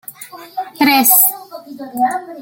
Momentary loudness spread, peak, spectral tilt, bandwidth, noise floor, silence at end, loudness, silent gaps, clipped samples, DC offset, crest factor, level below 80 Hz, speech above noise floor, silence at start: 23 LU; 0 dBFS; -1 dB/octave; over 20 kHz; -34 dBFS; 0 s; -12 LUFS; none; under 0.1%; under 0.1%; 16 dB; -66 dBFS; 21 dB; 0.1 s